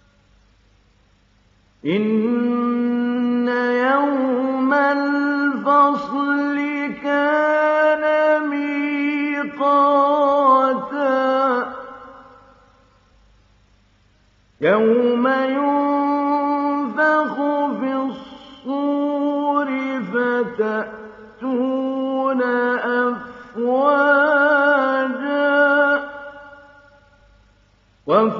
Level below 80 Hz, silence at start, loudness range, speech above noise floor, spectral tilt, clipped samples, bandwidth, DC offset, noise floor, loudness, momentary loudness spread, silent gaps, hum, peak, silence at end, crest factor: -64 dBFS; 1.85 s; 5 LU; 40 dB; -3.5 dB/octave; under 0.1%; 7 kHz; under 0.1%; -57 dBFS; -18 LUFS; 10 LU; none; none; -4 dBFS; 0 s; 16 dB